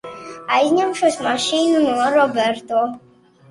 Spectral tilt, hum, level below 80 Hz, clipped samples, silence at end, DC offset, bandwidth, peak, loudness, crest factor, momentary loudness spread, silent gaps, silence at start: -3 dB/octave; none; -62 dBFS; under 0.1%; 0.5 s; under 0.1%; 11.5 kHz; -4 dBFS; -18 LUFS; 14 dB; 6 LU; none; 0.05 s